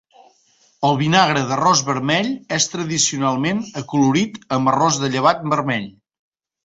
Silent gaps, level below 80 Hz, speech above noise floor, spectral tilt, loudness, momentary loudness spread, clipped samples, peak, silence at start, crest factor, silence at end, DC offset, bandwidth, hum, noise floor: none; -58 dBFS; 40 dB; -4 dB/octave; -18 LUFS; 7 LU; under 0.1%; -2 dBFS; 0.8 s; 18 dB; 0.75 s; under 0.1%; 8.2 kHz; none; -58 dBFS